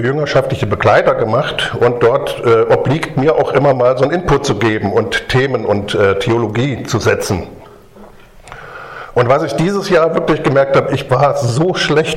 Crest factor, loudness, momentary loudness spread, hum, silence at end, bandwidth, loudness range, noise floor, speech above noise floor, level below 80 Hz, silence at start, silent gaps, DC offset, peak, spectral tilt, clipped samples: 14 dB; -13 LUFS; 6 LU; none; 0 s; 15.5 kHz; 5 LU; -38 dBFS; 25 dB; -38 dBFS; 0 s; none; under 0.1%; 0 dBFS; -6 dB/octave; under 0.1%